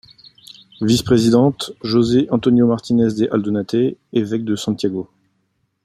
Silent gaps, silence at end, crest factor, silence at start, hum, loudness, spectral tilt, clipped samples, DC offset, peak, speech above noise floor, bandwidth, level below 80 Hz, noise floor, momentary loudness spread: none; 0.8 s; 16 dB; 0.5 s; none; -17 LUFS; -6.5 dB/octave; under 0.1%; under 0.1%; -2 dBFS; 51 dB; 15 kHz; -50 dBFS; -67 dBFS; 8 LU